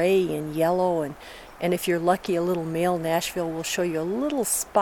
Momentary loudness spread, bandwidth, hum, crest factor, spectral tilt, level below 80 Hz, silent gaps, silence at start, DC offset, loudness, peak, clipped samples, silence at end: 6 LU; 19 kHz; none; 18 dB; -4.5 dB/octave; -56 dBFS; none; 0 s; under 0.1%; -25 LUFS; -8 dBFS; under 0.1%; 0 s